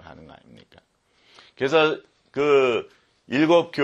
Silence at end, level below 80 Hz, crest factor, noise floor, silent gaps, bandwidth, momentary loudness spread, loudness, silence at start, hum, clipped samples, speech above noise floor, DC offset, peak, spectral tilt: 0 s; -66 dBFS; 18 dB; -63 dBFS; none; 8.2 kHz; 11 LU; -21 LUFS; 1.6 s; none; under 0.1%; 43 dB; under 0.1%; -6 dBFS; -5.5 dB/octave